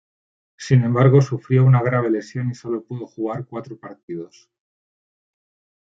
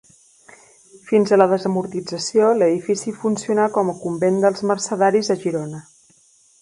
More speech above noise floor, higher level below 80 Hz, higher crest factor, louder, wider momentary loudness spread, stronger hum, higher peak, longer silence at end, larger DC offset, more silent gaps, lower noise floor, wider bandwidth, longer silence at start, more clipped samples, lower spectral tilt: first, over 71 dB vs 37 dB; about the same, -62 dBFS vs -66 dBFS; about the same, 18 dB vs 20 dB; about the same, -19 LUFS vs -19 LUFS; first, 18 LU vs 9 LU; neither; about the same, -2 dBFS vs 0 dBFS; first, 1.6 s vs 0.8 s; neither; first, 4.03-4.08 s vs none; first, under -90 dBFS vs -55 dBFS; second, 7.4 kHz vs 11.5 kHz; second, 0.6 s vs 1.05 s; neither; first, -8.5 dB/octave vs -5 dB/octave